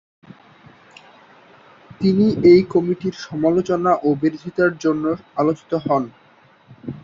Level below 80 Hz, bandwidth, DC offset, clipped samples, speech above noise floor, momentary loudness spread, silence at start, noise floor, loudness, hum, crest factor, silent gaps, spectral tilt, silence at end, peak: -56 dBFS; 7.4 kHz; under 0.1%; under 0.1%; 35 dB; 11 LU; 2 s; -52 dBFS; -18 LUFS; none; 18 dB; none; -7.5 dB/octave; 0.05 s; -2 dBFS